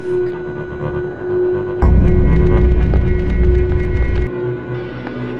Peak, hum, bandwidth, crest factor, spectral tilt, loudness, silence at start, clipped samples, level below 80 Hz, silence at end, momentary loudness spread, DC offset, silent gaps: -2 dBFS; none; 4.5 kHz; 14 dB; -10 dB/octave; -17 LUFS; 0 s; under 0.1%; -18 dBFS; 0 s; 11 LU; 0.6%; none